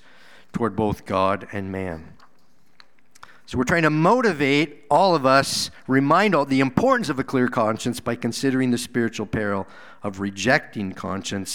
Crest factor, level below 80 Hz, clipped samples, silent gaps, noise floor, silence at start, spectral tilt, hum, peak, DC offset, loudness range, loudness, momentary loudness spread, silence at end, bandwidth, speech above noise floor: 22 dB; -52 dBFS; under 0.1%; none; -62 dBFS; 0.55 s; -5 dB/octave; none; 0 dBFS; 0.5%; 7 LU; -21 LUFS; 12 LU; 0 s; 17 kHz; 41 dB